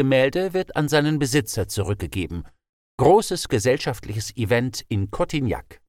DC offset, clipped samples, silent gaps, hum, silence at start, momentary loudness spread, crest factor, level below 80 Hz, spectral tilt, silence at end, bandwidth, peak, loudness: under 0.1%; under 0.1%; 2.69-2.98 s; none; 0 s; 11 LU; 18 dB; -44 dBFS; -5.5 dB/octave; 0.15 s; 17.5 kHz; -4 dBFS; -22 LUFS